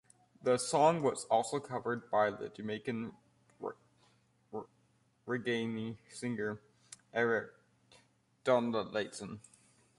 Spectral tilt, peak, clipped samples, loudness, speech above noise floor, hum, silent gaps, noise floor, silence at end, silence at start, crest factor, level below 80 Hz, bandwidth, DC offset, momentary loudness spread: -4.5 dB/octave; -14 dBFS; under 0.1%; -35 LUFS; 38 dB; none; none; -72 dBFS; 0.6 s; 0.45 s; 22 dB; -76 dBFS; 11.5 kHz; under 0.1%; 17 LU